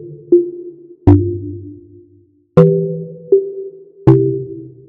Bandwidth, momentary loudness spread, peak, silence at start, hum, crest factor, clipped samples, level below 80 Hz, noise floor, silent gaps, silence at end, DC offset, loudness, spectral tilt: 4.2 kHz; 20 LU; 0 dBFS; 0 s; none; 16 dB; 0.1%; -38 dBFS; -51 dBFS; none; 0.2 s; under 0.1%; -14 LUFS; -12 dB/octave